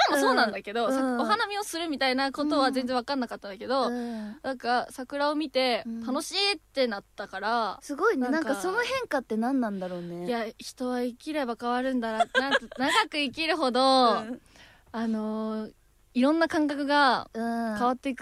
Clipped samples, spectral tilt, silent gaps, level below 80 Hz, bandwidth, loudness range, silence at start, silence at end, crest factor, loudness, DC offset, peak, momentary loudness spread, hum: under 0.1%; -3.5 dB/octave; none; -64 dBFS; 15 kHz; 4 LU; 0 s; 0 s; 20 dB; -27 LUFS; under 0.1%; -8 dBFS; 11 LU; none